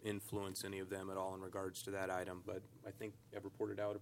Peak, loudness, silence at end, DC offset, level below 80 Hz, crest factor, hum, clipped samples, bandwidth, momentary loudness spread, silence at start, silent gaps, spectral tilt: -26 dBFS; -46 LUFS; 0 s; under 0.1%; -80 dBFS; 18 dB; none; under 0.1%; 16.5 kHz; 9 LU; 0 s; none; -4.5 dB/octave